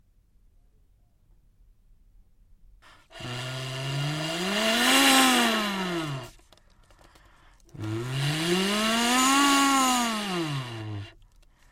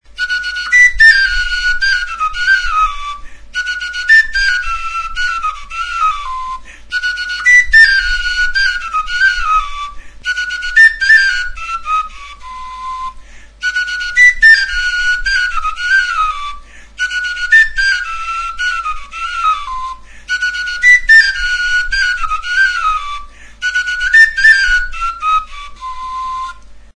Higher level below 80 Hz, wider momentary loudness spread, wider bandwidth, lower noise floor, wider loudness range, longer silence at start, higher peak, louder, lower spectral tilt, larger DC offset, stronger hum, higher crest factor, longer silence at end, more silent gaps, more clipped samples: second, -56 dBFS vs -30 dBFS; about the same, 18 LU vs 18 LU; first, 16.5 kHz vs 10.5 kHz; first, -61 dBFS vs -34 dBFS; first, 13 LU vs 4 LU; first, 3.15 s vs 0.1 s; second, -8 dBFS vs 0 dBFS; second, -24 LUFS vs -11 LUFS; first, -3 dB/octave vs 1.5 dB/octave; neither; neither; first, 20 dB vs 14 dB; first, 0.6 s vs 0.15 s; neither; neither